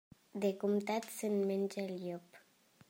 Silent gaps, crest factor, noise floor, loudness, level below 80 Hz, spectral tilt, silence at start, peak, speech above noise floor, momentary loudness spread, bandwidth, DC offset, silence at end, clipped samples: none; 16 dB; -67 dBFS; -37 LUFS; -84 dBFS; -6 dB/octave; 0.35 s; -22 dBFS; 30 dB; 11 LU; 16 kHz; under 0.1%; 0.5 s; under 0.1%